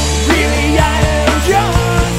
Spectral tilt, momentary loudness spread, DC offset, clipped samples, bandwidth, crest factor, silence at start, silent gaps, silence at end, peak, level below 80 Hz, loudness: -4.5 dB/octave; 1 LU; under 0.1%; under 0.1%; 16 kHz; 12 dB; 0 s; none; 0 s; 0 dBFS; -18 dBFS; -12 LUFS